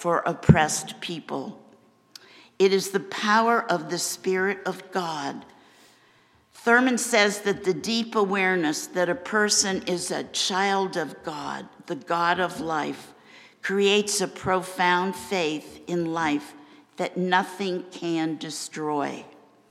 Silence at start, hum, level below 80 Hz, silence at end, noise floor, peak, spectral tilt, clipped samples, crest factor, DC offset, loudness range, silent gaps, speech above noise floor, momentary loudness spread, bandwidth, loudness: 0 s; none; -54 dBFS; 0.4 s; -60 dBFS; 0 dBFS; -4 dB/octave; under 0.1%; 24 dB; under 0.1%; 5 LU; none; 35 dB; 13 LU; 15.5 kHz; -25 LUFS